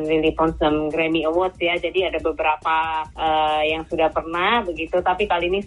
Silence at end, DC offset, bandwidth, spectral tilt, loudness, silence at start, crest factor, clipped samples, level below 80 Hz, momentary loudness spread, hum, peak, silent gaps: 0 s; under 0.1%; 11 kHz; -6 dB/octave; -21 LUFS; 0 s; 14 dB; under 0.1%; -42 dBFS; 3 LU; none; -6 dBFS; none